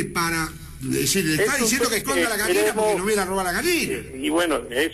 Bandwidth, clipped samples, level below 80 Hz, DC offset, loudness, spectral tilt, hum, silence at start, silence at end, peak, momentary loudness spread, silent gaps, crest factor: 13.5 kHz; under 0.1%; -44 dBFS; under 0.1%; -21 LUFS; -3 dB/octave; none; 0 s; 0 s; -10 dBFS; 7 LU; none; 12 dB